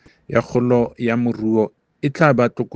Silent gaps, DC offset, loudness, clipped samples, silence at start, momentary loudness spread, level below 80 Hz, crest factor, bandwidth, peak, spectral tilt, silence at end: none; under 0.1%; -19 LUFS; under 0.1%; 0.3 s; 9 LU; -54 dBFS; 18 dB; 8 kHz; 0 dBFS; -8 dB/octave; 0 s